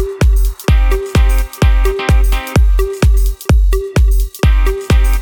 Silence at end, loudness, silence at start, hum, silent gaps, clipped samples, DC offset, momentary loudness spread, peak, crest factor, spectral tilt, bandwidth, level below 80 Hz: 0 s; -14 LUFS; 0 s; none; none; under 0.1%; under 0.1%; 2 LU; 0 dBFS; 10 dB; -6 dB/octave; 18.5 kHz; -12 dBFS